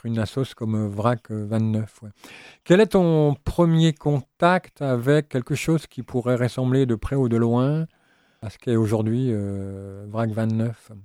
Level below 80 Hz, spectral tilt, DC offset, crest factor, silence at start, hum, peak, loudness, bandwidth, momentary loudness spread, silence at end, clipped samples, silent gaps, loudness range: -46 dBFS; -7.5 dB/octave; under 0.1%; 18 dB; 0.05 s; none; -4 dBFS; -22 LUFS; 14.5 kHz; 14 LU; 0 s; under 0.1%; none; 4 LU